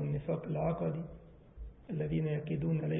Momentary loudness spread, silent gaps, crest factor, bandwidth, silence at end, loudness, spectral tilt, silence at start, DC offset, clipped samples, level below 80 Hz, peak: 18 LU; none; 14 dB; 3.8 kHz; 0 s; -36 LUFS; -8 dB/octave; 0 s; under 0.1%; under 0.1%; -54 dBFS; -22 dBFS